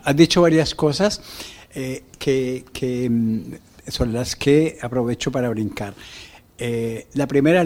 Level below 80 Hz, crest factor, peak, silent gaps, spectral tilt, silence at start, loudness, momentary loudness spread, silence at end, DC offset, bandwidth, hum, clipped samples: -44 dBFS; 20 dB; 0 dBFS; none; -5.5 dB/octave; 0.05 s; -21 LUFS; 18 LU; 0 s; under 0.1%; 16.5 kHz; none; under 0.1%